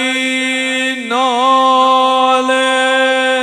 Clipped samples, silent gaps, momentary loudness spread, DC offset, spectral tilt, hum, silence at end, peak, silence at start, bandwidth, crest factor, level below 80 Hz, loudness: under 0.1%; none; 5 LU; under 0.1%; -0.5 dB/octave; none; 0 s; 0 dBFS; 0 s; 14 kHz; 12 dB; -68 dBFS; -12 LUFS